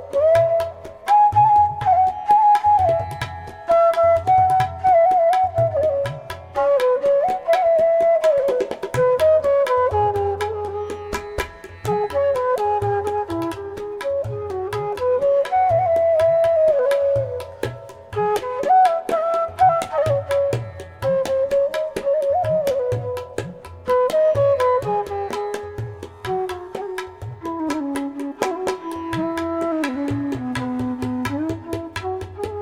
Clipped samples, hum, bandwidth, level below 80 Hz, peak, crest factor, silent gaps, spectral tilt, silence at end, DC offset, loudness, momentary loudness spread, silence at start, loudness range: under 0.1%; none; 16 kHz; -48 dBFS; -6 dBFS; 14 dB; none; -6.5 dB/octave; 0 s; under 0.1%; -20 LUFS; 14 LU; 0 s; 8 LU